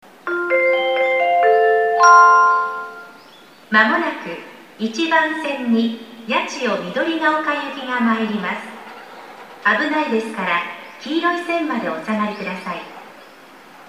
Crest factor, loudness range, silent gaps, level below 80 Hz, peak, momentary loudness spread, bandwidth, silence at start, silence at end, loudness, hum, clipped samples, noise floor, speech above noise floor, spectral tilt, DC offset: 18 dB; 7 LU; none; -74 dBFS; 0 dBFS; 18 LU; 15 kHz; 0.25 s; 0.05 s; -17 LUFS; none; under 0.1%; -45 dBFS; 25 dB; -4 dB/octave; 0.1%